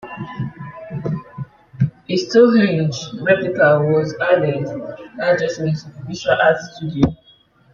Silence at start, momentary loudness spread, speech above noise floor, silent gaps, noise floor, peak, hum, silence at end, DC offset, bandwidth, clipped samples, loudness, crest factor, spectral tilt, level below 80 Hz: 0.05 s; 17 LU; 35 dB; none; -52 dBFS; -2 dBFS; none; 0.6 s; under 0.1%; 7.4 kHz; under 0.1%; -18 LUFS; 16 dB; -6.5 dB/octave; -48 dBFS